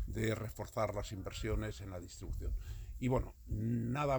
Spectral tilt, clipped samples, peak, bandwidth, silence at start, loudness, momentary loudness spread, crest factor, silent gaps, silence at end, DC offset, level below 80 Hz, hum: -6.5 dB/octave; under 0.1%; -20 dBFS; over 20 kHz; 0 s; -40 LUFS; 10 LU; 18 dB; none; 0 s; under 0.1%; -46 dBFS; none